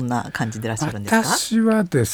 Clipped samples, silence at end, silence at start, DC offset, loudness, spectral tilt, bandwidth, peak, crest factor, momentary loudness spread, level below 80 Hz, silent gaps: under 0.1%; 0 s; 0 s; under 0.1%; -20 LUFS; -4.5 dB/octave; over 20 kHz; -4 dBFS; 16 dB; 7 LU; -52 dBFS; none